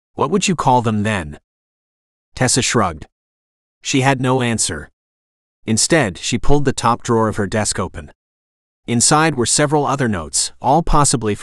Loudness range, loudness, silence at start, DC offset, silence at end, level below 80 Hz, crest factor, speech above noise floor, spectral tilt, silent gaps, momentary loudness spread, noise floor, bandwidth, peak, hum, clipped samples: 3 LU; -16 LUFS; 0.15 s; under 0.1%; 0 s; -30 dBFS; 18 dB; over 74 dB; -4 dB/octave; 1.44-2.32 s, 3.12-3.81 s, 4.93-5.63 s, 8.15-8.83 s; 10 LU; under -90 dBFS; 13 kHz; 0 dBFS; none; under 0.1%